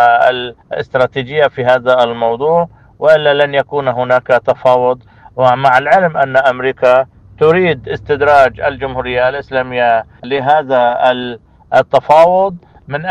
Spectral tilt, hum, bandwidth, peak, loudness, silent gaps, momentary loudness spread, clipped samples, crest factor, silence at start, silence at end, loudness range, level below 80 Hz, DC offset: -6.5 dB/octave; none; 8.8 kHz; 0 dBFS; -12 LUFS; none; 11 LU; 0.2%; 12 dB; 0 s; 0 s; 2 LU; -44 dBFS; under 0.1%